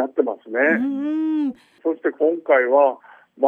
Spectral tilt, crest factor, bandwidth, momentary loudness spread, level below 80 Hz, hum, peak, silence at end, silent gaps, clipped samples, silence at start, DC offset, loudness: -7.5 dB/octave; 16 dB; 4.3 kHz; 10 LU; -76 dBFS; none; -4 dBFS; 0 s; none; under 0.1%; 0 s; under 0.1%; -20 LUFS